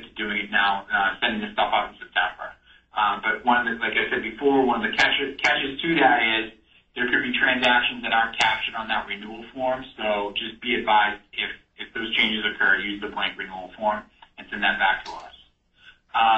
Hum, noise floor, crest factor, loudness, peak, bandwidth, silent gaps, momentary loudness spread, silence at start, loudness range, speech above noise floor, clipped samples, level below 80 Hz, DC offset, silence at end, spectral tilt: none; -57 dBFS; 18 dB; -23 LUFS; -6 dBFS; 8.2 kHz; none; 13 LU; 0 s; 4 LU; 33 dB; under 0.1%; -54 dBFS; under 0.1%; 0 s; -3.5 dB/octave